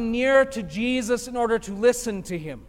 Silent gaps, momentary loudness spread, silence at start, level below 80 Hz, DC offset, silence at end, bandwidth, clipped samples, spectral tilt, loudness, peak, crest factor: none; 10 LU; 0 s; -48 dBFS; under 0.1%; 0 s; 16.5 kHz; under 0.1%; -4.5 dB/octave; -23 LUFS; -6 dBFS; 16 dB